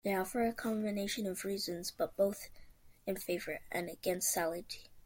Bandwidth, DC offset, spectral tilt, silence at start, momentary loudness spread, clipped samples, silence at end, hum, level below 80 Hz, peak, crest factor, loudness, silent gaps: 17 kHz; under 0.1%; -3.5 dB/octave; 0.05 s; 10 LU; under 0.1%; 0.05 s; none; -64 dBFS; -20 dBFS; 18 dB; -37 LUFS; none